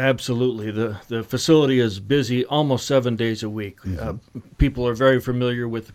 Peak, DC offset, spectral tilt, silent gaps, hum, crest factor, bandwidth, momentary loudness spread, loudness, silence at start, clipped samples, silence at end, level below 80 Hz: -4 dBFS; under 0.1%; -6 dB/octave; none; none; 16 dB; 15.5 kHz; 12 LU; -21 LUFS; 0 s; under 0.1%; 0 s; -38 dBFS